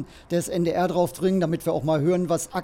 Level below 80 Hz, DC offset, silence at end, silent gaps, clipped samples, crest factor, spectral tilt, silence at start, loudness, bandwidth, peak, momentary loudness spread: -52 dBFS; under 0.1%; 0 s; none; under 0.1%; 14 dB; -6 dB/octave; 0 s; -24 LUFS; 16.5 kHz; -10 dBFS; 4 LU